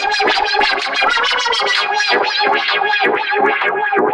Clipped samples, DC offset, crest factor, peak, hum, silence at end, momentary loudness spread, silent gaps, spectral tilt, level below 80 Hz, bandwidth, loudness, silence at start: under 0.1%; under 0.1%; 12 dB; -2 dBFS; none; 0 s; 1 LU; none; -1 dB/octave; -54 dBFS; 11 kHz; -14 LUFS; 0 s